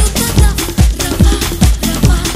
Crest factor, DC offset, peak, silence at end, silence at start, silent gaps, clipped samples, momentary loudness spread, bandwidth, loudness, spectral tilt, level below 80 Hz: 10 dB; under 0.1%; 0 dBFS; 0 s; 0 s; none; 0.3%; 1 LU; 16 kHz; -12 LUFS; -4.5 dB/octave; -14 dBFS